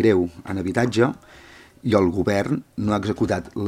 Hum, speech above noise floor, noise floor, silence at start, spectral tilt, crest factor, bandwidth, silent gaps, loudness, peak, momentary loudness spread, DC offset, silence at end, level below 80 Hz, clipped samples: none; 26 dB; -47 dBFS; 0 s; -7 dB/octave; 20 dB; 14.5 kHz; none; -22 LUFS; -2 dBFS; 8 LU; under 0.1%; 0 s; -52 dBFS; under 0.1%